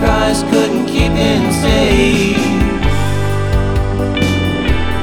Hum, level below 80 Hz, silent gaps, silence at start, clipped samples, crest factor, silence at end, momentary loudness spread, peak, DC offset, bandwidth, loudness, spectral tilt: none; -20 dBFS; none; 0 s; under 0.1%; 12 dB; 0 s; 5 LU; 0 dBFS; under 0.1%; 18 kHz; -14 LUFS; -5.5 dB/octave